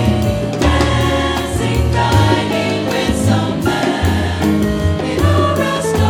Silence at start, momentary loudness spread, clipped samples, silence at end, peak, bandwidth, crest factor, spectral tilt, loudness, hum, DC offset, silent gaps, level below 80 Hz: 0 s; 4 LU; under 0.1%; 0 s; 0 dBFS; 17 kHz; 14 dB; -6 dB/octave; -15 LUFS; none; under 0.1%; none; -26 dBFS